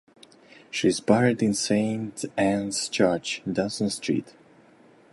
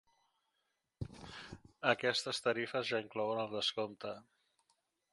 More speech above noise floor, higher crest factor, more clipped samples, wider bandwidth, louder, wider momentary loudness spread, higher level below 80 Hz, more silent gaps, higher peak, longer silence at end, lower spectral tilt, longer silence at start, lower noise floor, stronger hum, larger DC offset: second, 30 dB vs 47 dB; about the same, 22 dB vs 26 dB; neither; about the same, 11.5 kHz vs 11.5 kHz; first, -25 LUFS vs -37 LUFS; second, 8 LU vs 17 LU; first, -60 dBFS vs -66 dBFS; neither; first, -4 dBFS vs -14 dBFS; about the same, 0.85 s vs 0.9 s; about the same, -4.5 dB/octave vs -3.5 dB/octave; second, 0.55 s vs 1 s; second, -55 dBFS vs -84 dBFS; neither; neither